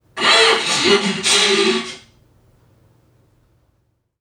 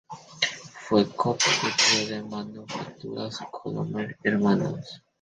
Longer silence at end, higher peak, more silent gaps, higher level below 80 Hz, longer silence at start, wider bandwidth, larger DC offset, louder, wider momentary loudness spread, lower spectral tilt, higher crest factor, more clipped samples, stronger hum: first, 2.2 s vs 0.25 s; first, 0 dBFS vs -6 dBFS; neither; about the same, -60 dBFS vs -64 dBFS; about the same, 0.15 s vs 0.1 s; first, 16.5 kHz vs 10 kHz; neither; first, -14 LUFS vs -25 LUFS; second, 8 LU vs 16 LU; second, -1.5 dB/octave vs -3.5 dB/octave; about the same, 18 dB vs 20 dB; neither; neither